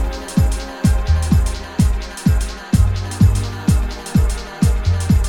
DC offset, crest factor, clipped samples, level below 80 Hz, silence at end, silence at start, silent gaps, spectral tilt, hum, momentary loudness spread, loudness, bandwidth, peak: under 0.1%; 14 dB; under 0.1%; -20 dBFS; 0 s; 0 s; none; -6 dB/octave; none; 4 LU; -18 LUFS; 17 kHz; -2 dBFS